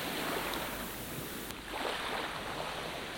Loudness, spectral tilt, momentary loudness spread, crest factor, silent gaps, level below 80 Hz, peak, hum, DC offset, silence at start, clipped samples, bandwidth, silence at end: -37 LUFS; -3 dB/octave; 5 LU; 22 dB; none; -56 dBFS; -18 dBFS; none; under 0.1%; 0 s; under 0.1%; 17.5 kHz; 0 s